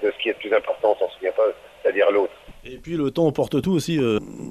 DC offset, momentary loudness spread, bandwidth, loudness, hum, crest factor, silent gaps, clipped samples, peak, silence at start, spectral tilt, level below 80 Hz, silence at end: under 0.1%; 7 LU; 14 kHz; -22 LUFS; none; 16 dB; none; under 0.1%; -6 dBFS; 0 s; -6 dB/octave; -52 dBFS; 0 s